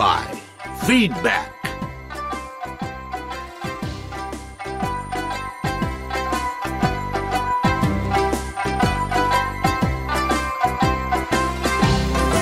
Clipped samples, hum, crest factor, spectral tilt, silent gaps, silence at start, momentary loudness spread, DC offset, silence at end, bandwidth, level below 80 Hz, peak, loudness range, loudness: under 0.1%; none; 18 dB; -5 dB/octave; none; 0 s; 12 LU; under 0.1%; 0 s; 16 kHz; -32 dBFS; -4 dBFS; 8 LU; -22 LUFS